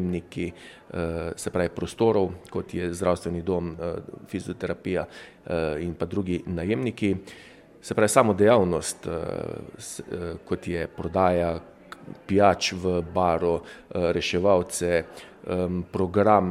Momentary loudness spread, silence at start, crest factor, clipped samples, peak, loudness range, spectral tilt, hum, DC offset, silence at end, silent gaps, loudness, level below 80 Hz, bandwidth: 17 LU; 0 s; 22 dB; under 0.1%; -2 dBFS; 6 LU; -5.5 dB/octave; none; under 0.1%; 0 s; none; -26 LUFS; -50 dBFS; 15.5 kHz